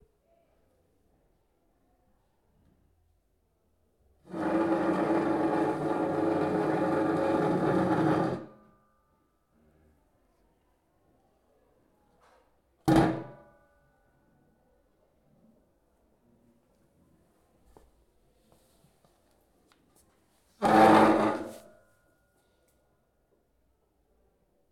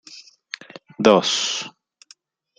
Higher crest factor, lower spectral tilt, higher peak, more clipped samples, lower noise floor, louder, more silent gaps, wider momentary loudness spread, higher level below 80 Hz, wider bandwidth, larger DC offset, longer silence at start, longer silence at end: about the same, 24 dB vs 22 dB; first, -7 dB/octave vs -3 dB/octave; second, -8 dBFS vs 0 dBFS; neither; first, -72 dBFS vs -54 dBFS; second, -27 LUFS vs -18 LUFS; neither; second, 17 LU vs 23 LU; about the same, -60 dBFS vs -64 dBFS; first, 14.5 kHz vs 9.6 kHz; neither; first, 4.3 s vs 0.1 s; first, 3.15 s vs 0.9 s